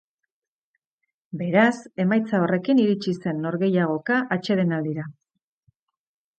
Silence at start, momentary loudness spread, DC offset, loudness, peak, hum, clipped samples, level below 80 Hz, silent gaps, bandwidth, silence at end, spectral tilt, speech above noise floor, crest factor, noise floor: 1.35 s; 10 LU; under 0.1%; -23 LUFS; -6 dBFS; none; under 0.1%; -72 dBFS; none; 8.8 kHz; 1.25 s; -7.5 dB/octave; 63 dB; 18 dB; -85 dBFS